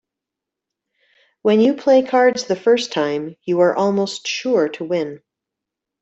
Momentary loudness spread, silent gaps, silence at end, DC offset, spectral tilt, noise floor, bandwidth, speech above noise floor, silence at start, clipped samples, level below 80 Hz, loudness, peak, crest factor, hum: 8 LU; none; 0.85 s; under 0.1%; -5 dB/octave; -84 dBFS; 8.2 kHz; 67 dB; 1.45 s; under 0.1%; -68 dBFS; -18 LUFS; -4 dBFS; 16 dB; none